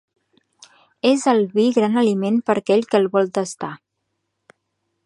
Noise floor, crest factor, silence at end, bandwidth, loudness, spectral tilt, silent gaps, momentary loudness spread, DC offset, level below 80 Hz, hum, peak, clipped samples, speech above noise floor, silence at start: -75 dBFS; 18 dB; 1.3 s; 11.5 kHz; -19 LUFS; -5.5 dB/octave; none; 8 LU; under 0.1%; -70 dBFS; none; -2 dBFS; under 0.1%; 57 dB; 1.05 s